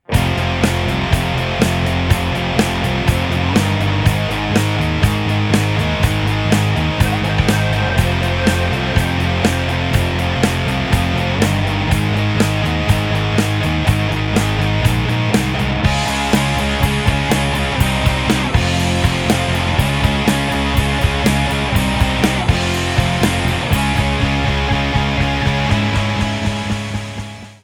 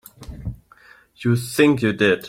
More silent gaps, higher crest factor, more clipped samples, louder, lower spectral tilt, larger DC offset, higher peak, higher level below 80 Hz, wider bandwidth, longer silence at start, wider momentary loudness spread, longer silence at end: neither; about the same, 16 dB vs 18 dB; neither; first, -16 LUFS vs -19 LUFS; about the same, -5.5 dB/octave vs -6 dB/octave; neither; about the same, 0 dBFS vs -2 dBFS; first, -26 dBFS vs -44 dBFS; first, 18.5 kHz vs 16.5 kHz; about the same, 0.1 s vs 0.2 s; second, 2 LU vs 18 LU; about the same, 0.1 s vs 0 s